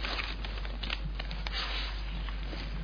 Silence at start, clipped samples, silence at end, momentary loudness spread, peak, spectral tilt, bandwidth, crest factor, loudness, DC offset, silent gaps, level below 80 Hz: 0 s; under 0.1%; 0 s; 5 LU; -16 dBFS; -5 dB/octave; 5.4 kHz; 18 dB; -37 LUFS; under 0.1%; none; -36 dBFS